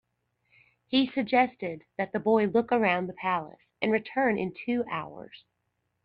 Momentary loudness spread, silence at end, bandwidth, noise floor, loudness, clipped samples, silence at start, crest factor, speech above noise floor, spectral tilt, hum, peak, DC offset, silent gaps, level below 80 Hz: 12 LU; 0.65 s; 5.4 kHz; -78 dBFS; -28 LUFS; under 0.1%; 0.9 s; 20 dB; 51 dB; -8 dB/octave; 60 Hz at -55 dBFS; -10 dBFS; under 0.1%; none; -68 dBFS